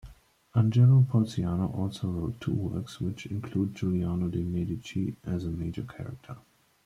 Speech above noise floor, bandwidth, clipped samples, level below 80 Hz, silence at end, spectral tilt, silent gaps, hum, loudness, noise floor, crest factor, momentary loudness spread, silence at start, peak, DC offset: 24 dB; 10.5 kHz; under 0.1%; -54 dBFS; 0.45 s; -8.5 dB/octave; none; none; -29 LUFS; -52 dBFS; 18 dB; 16 LU; 0.05 s; -12 dBFS; under 0.1%